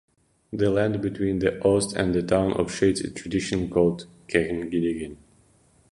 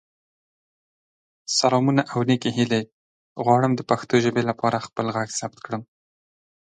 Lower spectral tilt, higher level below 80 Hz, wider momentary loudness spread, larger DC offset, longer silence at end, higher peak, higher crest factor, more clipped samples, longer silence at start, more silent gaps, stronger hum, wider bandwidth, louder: about the same, -5.5 dB/octave vs -5 dB/octave; first, -48 dBFS vs -64 dBFS; second, 7 LU vs 13 LU; neither; second, 0.8 s vs 0.95 s; about the same, -4 dBFS vs -4 dBFS; about the same, 20 dB vs 20 dB; neither; second, 0.5 s vs 1.5 s; second, none vs 2.93-3.35 s; neither; first, 11.5 kHz vs 9.4 kHz; about the same, -24 LUFS vs -22 LUFS